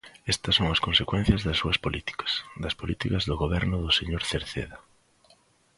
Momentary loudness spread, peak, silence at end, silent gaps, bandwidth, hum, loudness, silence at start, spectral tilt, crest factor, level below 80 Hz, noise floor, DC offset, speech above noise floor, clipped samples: 9 LU; -6 dBFS; 0.95 s; none; 11.5 kHz; none; -26 LUFS; 0.05 s; -4.5 dB/octave; 22 dB; -40 dBFS; -62 dBFS; under 0.1%; 35 dB; under 0.1%